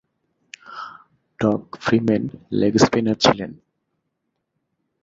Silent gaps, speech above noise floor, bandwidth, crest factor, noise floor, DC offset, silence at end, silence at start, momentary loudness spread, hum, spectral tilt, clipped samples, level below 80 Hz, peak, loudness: none; 57 dB; 7.8 kHz; 22 dB; -76 dBFS; under 0.1%; 1.5 s; 0.7 s; 19 LU; none; -5.5 dB/octave; under 0.1%; -54 dBFS; 0 dBFS; -20 LUFS